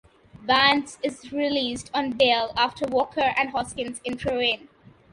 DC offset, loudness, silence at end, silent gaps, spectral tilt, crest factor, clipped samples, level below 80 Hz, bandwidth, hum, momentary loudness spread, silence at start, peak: under 0.1%; -24 LUFS; 0.55 s; none; -3.5 dB/octave; 22 dB; under 0.1%; -54 dBFS; 11.5 kHz; none; 12 LU; 0.4 s; -4 dBFS